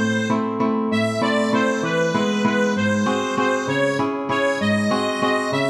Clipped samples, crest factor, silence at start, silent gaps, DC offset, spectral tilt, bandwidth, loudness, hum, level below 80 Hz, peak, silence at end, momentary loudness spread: under 0.1%; 14 dB; 0 s; none; under 0.1%; -5 dB/octave; 11.5 kHz; -20 LUFS; none; -62 dBFS; -6 dBFS; 0 s; 2 LU